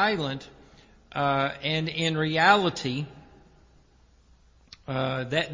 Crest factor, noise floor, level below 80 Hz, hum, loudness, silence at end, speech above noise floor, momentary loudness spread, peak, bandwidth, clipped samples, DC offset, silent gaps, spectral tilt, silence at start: 24 dB; -59 dBFS; -58 dBFS; none; -26 LUFS; 0 s; 33 dB; 16 LU; -4 dBFS; 7.6 kHz; under 0.1%; under 0.1%; none; -5 dB/octave; 0 s